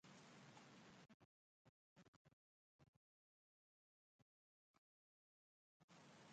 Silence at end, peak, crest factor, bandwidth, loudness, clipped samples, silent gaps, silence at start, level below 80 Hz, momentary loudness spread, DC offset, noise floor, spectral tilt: 0 s; -52 dBFS; 20 dB; 8.8 kHz; -66 LUFS; under 0.1%; 1.14-1.96 s, 2.08-2.25 s, 2.33-2.79 s, 2.88-5.88 s; 0.05 s; under -90 dBFS; 4 LU; under 0.1%; under -90 dBFS; -4 dB/octave